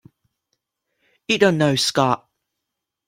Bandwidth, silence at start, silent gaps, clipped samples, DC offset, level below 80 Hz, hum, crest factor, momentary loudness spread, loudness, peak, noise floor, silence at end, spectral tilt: 16.5 kHz; 1.3 s; none; under 0.1%; under 0.1%; -62 dBFS; none; 22 dB; 10 LU; -19 LUFS; -2 dBFS; -82 dBFS; 0.9 s; -4.5 dB/octave